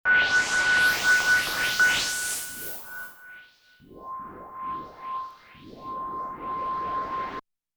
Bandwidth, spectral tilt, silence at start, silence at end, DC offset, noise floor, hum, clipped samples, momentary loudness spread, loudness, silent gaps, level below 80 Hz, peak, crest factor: over 20 kHz; 0 dB/octave; 0.05 s; 0.35 s; under 0.1%; -55 dBFS; none; under 0.1%; 20 LU; -24 LUFS; none; -58 dBFS; -10 dBFS; 16 dB